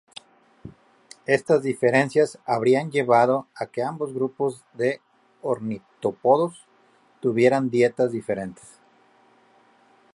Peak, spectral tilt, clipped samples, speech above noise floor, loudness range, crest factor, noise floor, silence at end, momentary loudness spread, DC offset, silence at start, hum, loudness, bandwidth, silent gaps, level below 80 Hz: -4 dBFS; -6.5 dB/octave; under 0.1%; 37 dB; 4 LU; 20 dB; -59 dBFS; 1.6 s; 12 LU; under 0.1%; 0.65 s; none; -23 LUFS; 11.5 kHz; none; -68 dBFS